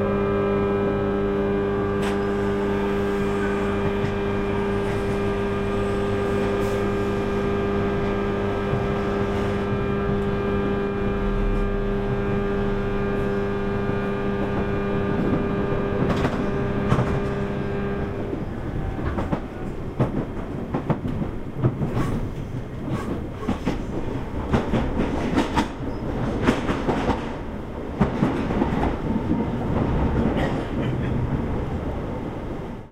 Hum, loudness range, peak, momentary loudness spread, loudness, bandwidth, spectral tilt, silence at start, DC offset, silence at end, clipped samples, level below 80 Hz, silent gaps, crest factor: none; 4 LU; -4 dBFS; 7 LU; -25 LUFS; 13.5 kHz; -8 dB/octave; 0 s; under 0.1%; 0 s; under 0.1%; -32 dBFS; none; 18 dB